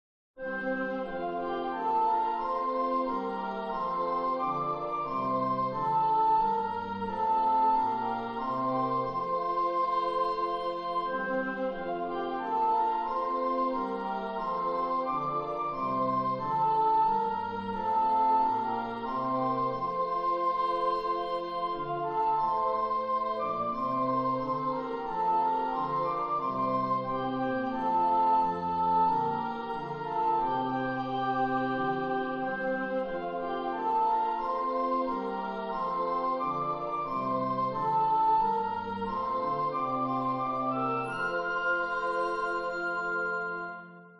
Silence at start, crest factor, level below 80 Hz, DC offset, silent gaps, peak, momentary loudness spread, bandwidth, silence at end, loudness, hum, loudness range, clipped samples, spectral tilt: 0.35 s; 12 dB; -62 dBFS; under 0.1%; none; -18 dBFS; 7 LU; 6.8 kHz; 0 s; -30 LUFS; none; 3 LU; under 0.1%; -7.5 dB/octave